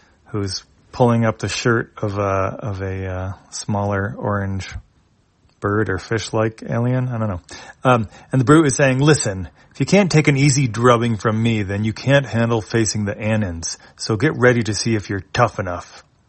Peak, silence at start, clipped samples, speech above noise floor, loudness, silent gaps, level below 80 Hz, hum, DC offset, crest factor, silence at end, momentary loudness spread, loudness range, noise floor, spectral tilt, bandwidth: 0 dBFS; 0.35 s; under 0.1%; 40 dB; -19 LUFS; none; -48 dBFS; none; under 0.1%; 18 dB; 0.3 s; 13 LU; 8 LU; -58 dBFS; -5.5 dB/octave; 8.8 kHz